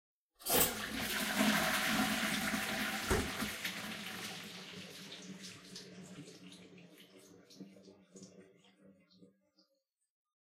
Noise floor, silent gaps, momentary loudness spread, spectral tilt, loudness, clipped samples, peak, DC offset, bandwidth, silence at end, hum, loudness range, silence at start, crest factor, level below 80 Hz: -83 dBFS; none; 25 LU; -2.5 dB/octave; -35 LUFS; under 0.1%; -16 dBFS; under 0.1%; 16 kHz; 1.25 s; none; 23 LU; 0.4 s; 24 dB; -58 dBFS